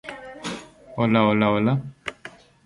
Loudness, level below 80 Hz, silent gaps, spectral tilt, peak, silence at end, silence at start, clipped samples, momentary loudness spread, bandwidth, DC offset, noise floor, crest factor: -22 LUFS; -56 dBFS; none; -7 dB/octave; -4 dBFS; 0.35 s; 0.05 s; under 0.1%; 19 LU; 11.5 kHz; under 0.1%; -45 dBFS; 20 dB